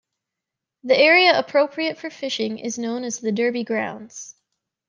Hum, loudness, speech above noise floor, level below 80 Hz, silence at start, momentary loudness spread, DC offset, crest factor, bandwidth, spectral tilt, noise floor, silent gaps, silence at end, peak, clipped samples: none; -20 LUFS; 64 dB; -76 dBFS; 0.85 s; 22 LU; under 0.1%; 20 dB; 10 kHz; -3 dB/octave; -85 dBFS; none; 0.55 s; -2 dBFS; under 0.1%